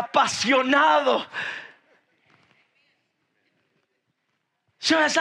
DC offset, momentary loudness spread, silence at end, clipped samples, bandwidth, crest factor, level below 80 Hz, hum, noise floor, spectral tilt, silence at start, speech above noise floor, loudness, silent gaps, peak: under 0.1%; 13 LU; 0 s; under 0.1%; 12 kHz; 20 dB; -76 dBFS; none; -75 dBFS; -2 dB/octave; 0 s; 54 dB; -21 LUFS; none; -6 dBFS